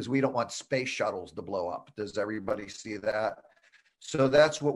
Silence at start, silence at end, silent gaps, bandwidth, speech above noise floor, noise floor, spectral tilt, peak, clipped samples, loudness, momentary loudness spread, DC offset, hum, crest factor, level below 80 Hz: 0 s; 0 s; none; 11.5 kHz; 35 dB; -64 dBFS; -5 dB/octave; -10 dBFS; under 0.1%; -30 LUFS; 15 LU; under 0.1%; none; 20 dB; -64 dBFS